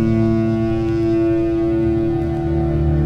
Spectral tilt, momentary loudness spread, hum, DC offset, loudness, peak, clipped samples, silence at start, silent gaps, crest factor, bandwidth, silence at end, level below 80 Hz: -10 dB/octave; 3 LU; none; under 0.1%; -18 LUFS; -6 dBFS; under 0.1%; 0 s; none; 10 dB; 6.2 kHz; 0 s; -28 dBFS